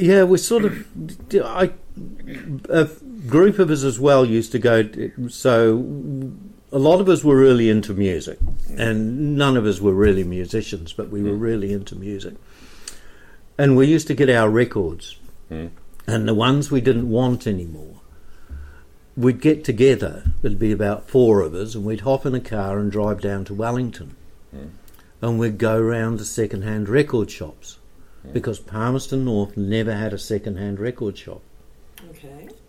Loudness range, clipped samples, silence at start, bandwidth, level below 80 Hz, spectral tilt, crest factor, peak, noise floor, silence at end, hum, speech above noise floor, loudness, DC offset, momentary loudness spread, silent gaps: 7 LU; under 0.1%; 0 s; 15.5 kHz; -36 dBFS; -6.5 dB/octave; 16 dB; -4 dBFS; -44 dBFS; 0.15 s; none; 26 dB; -19 LUFS; under 0.1%; 19 LU; none